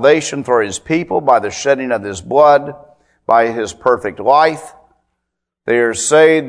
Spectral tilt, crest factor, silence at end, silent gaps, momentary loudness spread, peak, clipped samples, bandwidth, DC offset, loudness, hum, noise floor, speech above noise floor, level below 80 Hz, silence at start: -4 dB/octave; 14 dB; 0 s; none; 9 LU; 0 dBFS; under 0.1%; 11 kHz; under 0.1%; -14 LUFS; none; -76 dBFS; 63 dB; -54 dBFS; 0 s